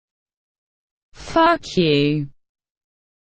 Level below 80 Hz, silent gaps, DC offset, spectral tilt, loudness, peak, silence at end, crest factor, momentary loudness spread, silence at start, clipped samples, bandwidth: -50 dBFS; none; under 0.1%; -6 dB/octave; -18 LUFS; -4 dBFS; 0.95 s; 20 dB; 9 LU; 1.2 s; under 0.1%; 9 kHz